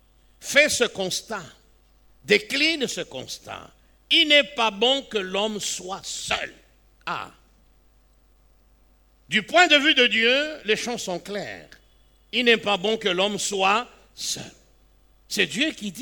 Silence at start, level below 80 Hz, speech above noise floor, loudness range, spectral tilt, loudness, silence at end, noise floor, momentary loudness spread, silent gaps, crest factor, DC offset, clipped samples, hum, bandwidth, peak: 0.4 s; -58 dBFS; 35 dB; 9 LU; -2 dB/octave; -21 LUFS; 0 s; -58 dBFS; 18 LU; none; 20 dB; under 0.1%; under 0.1%; none; over 20 kHz; -4 dBFS